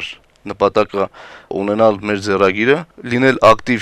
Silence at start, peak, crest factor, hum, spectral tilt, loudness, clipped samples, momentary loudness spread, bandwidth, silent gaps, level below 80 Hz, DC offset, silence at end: 0 s; 0 dBFS; 16 dB; none; -5.5 dB/octave; -15 LUFS; under 0.1%; 14 LU; 12.5 kHz; none; -46 dBFS; under 0.1%; 0 s